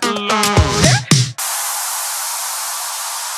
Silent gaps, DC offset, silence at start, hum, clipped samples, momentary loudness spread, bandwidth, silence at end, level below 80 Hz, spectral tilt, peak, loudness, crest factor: none; under 0.1%; 0 s; none; under 0.1%; 8 LU; over 20 kHz; 0 s; -32 dBFS; -3 dB/octave; 0 dBFS; -16 LUFS; 18 dB